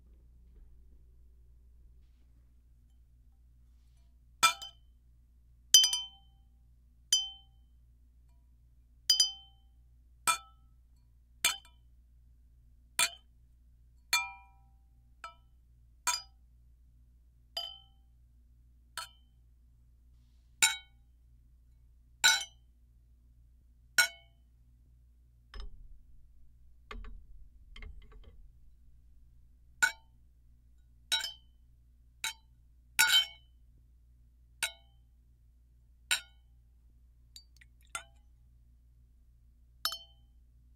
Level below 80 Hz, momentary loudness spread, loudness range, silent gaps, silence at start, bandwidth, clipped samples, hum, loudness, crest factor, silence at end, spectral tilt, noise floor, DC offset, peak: -58 dBFS; 27 LU; 15 LU; none; 4.4 s; 16 kHz; under 0.1%; none; -30 LUFS; 34 dB; 0.75 s; 2 dB/octave; -62 dBFS; under 0.1%; -4 dBFS